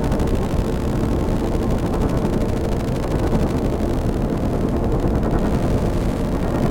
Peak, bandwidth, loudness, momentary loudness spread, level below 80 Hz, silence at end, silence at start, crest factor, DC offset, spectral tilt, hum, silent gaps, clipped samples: -6 dBFS; 17 kHz; -21 LUFS; 2 LU; -24 dBFS; 0 s; 0 s; 14 dB; under 0.1%; -7.5 dB/octave; none; none; under 0.1%